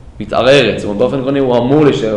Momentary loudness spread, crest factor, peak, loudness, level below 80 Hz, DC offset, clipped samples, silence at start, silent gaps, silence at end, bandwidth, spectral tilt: 6 LU; 10 dB; 0 dBFS; -12 LUFS; -38 dBFS; under 0.1%; under 0.1%; 0.05 s; none; 0 s; 10.5 kHz; -6 dB/octave